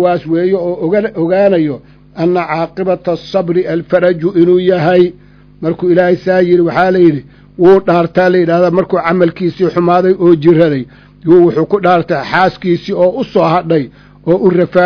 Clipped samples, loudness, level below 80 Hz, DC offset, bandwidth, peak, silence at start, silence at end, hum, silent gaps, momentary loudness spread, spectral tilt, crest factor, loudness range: 0.9%; -11 LUFS; -46 dBFS; under 0.1%; 5.4 kHz; 0 dBFS; 0 s; 0 s; 50 Hz at -40 dBFS; none; 7 LU; -9 dB/octave; 10 dB; 3 LU